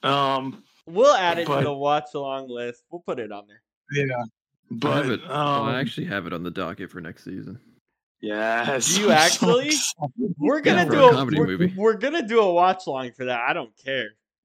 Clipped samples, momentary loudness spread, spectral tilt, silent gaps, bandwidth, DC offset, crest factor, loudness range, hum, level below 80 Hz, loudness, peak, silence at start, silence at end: under 0.1%; 19 LU; -4 dB/octave; 3.76-3.81 s, 4.59-4.63 s, 7.81-7.85 s, 8.03-8.15 s; 16 kHz; under 0.1%; 22 dB; 10 LU; none; -66 dBFS; -22 LUFS; 0 dBFS; 0.05 s; 0.35 s